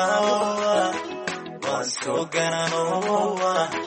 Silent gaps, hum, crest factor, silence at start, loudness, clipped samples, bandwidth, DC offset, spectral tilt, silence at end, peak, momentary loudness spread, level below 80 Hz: none; none; 16 dB; 0 s; -24 LUFS; under 0.1%; 8.8 kHz; under 0.1%; -3.5 dB/octave; 0 s; -8 dBFS; 8 LU; -68 dBFS